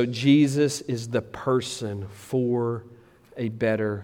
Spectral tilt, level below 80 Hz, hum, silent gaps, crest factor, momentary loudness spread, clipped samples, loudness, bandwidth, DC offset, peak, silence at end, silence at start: -6 dB/octave; -62 dBFS; none; none; 16 dB; 14 LU; under 0.1%; -25 LUFS; 15.5 kHz; under 0.1%; -8 dBFS; 0 s; 0 s